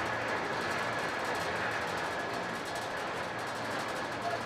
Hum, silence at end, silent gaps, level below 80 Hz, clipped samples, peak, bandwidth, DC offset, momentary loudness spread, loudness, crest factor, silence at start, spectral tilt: none; 0 s; none; -66 dBFS; under 0.1%; -22 dBFS; 16 kHz; under 0.1%; 3 LU; -34 LUFS; 14 dB; 0 s; -3.5 dB/octave